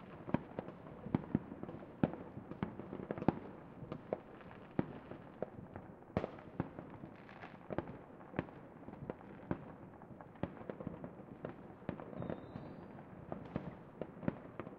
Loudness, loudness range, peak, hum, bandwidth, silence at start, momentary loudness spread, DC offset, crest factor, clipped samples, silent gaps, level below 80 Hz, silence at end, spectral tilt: -46 LUFS; 6 LU; -14 dBFS; none; 5.8 kHz; 0 s; 14 LU; under 0.1%; 30 dB; under 0.1%; none; -66 dBFS; 0 s; -8 dB/octave